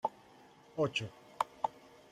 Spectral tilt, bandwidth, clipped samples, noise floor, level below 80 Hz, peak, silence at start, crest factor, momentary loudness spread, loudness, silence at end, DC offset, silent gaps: -4.5 dB/octave; 16 kHz; under 0.1%; -60 dBFS; -76 dBFS; -16 dBFS; 0.05 s; 24 dB; 13 LU; -38 LUFS; 0.4 s; under 0.1%; none